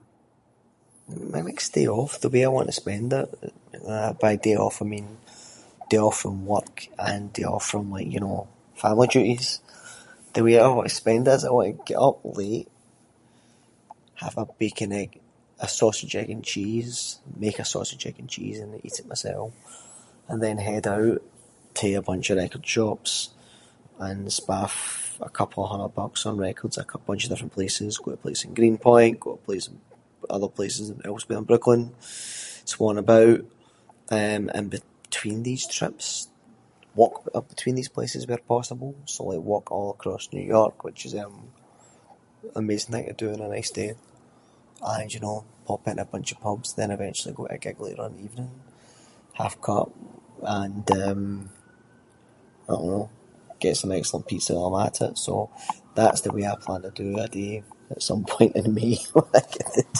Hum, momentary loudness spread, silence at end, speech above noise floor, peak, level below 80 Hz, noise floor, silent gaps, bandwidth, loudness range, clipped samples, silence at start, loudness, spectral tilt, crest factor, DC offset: none; 15 LU; 0 s; 38 dB; 0 dBFS; -56 dBFS; -62 dBFS; none; 11.5 kHz; 10 LU; under 0.1%; 1.1 s; -25 LUFS; -4.5 dB/octave; 26 dB; under 0.1%